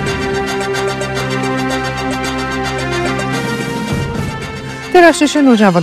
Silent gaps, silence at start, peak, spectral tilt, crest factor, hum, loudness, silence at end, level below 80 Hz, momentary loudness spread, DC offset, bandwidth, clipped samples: none; 0 s; 0 dBFS; -5 dB/octave; 14 dB; none; -15 LUFS; 0 s; -36 dBFS; 11 LU; under 0.1%; 14 kHz; 0.3%